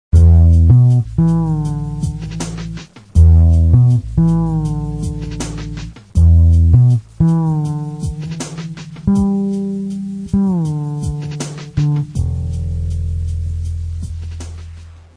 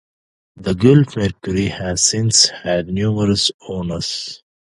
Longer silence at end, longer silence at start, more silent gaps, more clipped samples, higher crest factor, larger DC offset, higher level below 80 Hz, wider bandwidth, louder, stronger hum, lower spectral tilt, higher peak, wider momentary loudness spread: second, 0.2 s vs 0.4 s; second, 0.15 s vs 0.55 s; second, none vs 3.54-3.59 s; neither; about the same, 14 dB vs 18 dB; neither; first, -20 dBFS vs -40 dBFS; about the same, 10.5 kHz vs 11.5 kHz; about the same, -15 LUFS vs -16 LUFS; neither; first, -8.5 dB/octave vs -4 dB/octave; about the same, 0 dBFS vs 0 dBFS; first, 16 LU vs 12 LU